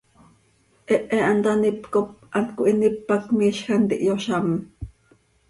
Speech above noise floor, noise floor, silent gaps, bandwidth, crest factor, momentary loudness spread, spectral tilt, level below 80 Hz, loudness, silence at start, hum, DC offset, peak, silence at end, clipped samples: 40 dB; -61 dBFS; none; 11.5 kHz; 16 dB; 7 LU; -6.5 dB/octave; -52 dBFS; -22 LUFS; 0.9 s; none; under 0.1%; -6 dBFS; 0.6 s; under 0.1%